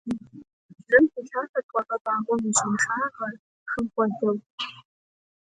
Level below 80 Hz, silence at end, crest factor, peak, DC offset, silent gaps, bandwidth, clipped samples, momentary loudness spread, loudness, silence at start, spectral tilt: -64 dBFS; 0.8 s; 22 dB; -4 dBFS; under 0.1%; 0.53-0.69 s, 1.49-1.54 s, 1.63-1.69 s, 2.01-2.05 s, 3.39-3.66 s, 4.46-4.58 s; 9.6 kHz; under 0.1%; 15 LU; -25 LUFS; 0.05 s; -3.5 dB/octave